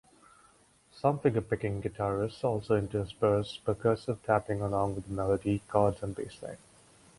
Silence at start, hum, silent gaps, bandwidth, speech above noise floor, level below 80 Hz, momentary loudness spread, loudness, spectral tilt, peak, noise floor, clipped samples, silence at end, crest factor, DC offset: 0.95 s; none; none; 11.5 kHz; 33 dB; -54 dBFS; 10 LU; -31 LUFS; -7.5 dB/octave; -10 dBFS; -63 dBFS; under 0.1%; 0.6 s; 20 dB; under 0.1%